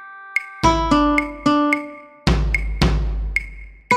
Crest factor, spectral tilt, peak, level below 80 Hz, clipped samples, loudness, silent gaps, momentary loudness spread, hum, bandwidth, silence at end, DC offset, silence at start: 18 dB; -5.5 dB/octave; -2 dBFS; -26 dBFS; under 0.1%; -20 LUFS; none; 8 LU; none; 13 kHz; 0 s; under 0.1%; 0 s